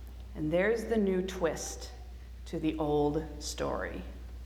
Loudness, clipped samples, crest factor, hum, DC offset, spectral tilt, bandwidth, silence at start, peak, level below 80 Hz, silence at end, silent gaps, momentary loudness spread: -32 LUFS; under 0.1%; 16 dB; none; under 0.1%; -5.5 dB/octave; 19 kHz; 0 s; -16 dBFS; -44 dBFS; 0 s; none; 17 LU